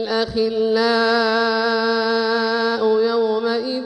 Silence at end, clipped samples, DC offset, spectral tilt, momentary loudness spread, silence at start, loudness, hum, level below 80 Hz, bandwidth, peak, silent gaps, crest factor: 0 s; under 0.1%; under 0.1%; -4.5 dB/octave; 4 LU; 0 s; -18 LUFS; none; -54 dBFS; 9.8 kHz; -6 dBFS; none; 12 dB